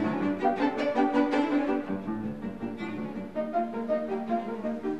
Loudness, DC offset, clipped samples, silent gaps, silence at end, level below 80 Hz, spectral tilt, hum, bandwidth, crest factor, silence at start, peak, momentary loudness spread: -29 LUFS; 0.3%; under 0.1%; none; 0 s; -62 dBFS; -7 dB/octave; none; 8.4 kHz; 16 dB; 0 s; -12 dBFS; 10 LU